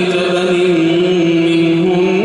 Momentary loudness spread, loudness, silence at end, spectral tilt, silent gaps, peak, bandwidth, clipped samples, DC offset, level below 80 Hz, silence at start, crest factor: 2 LU; -12 LUFS; 0 s; -6.5 dB/octave; none; -2 dBFS; 10.5 kHz; under 0.1%; under 0.1%; -54 dBFS; 0 s; 10 dB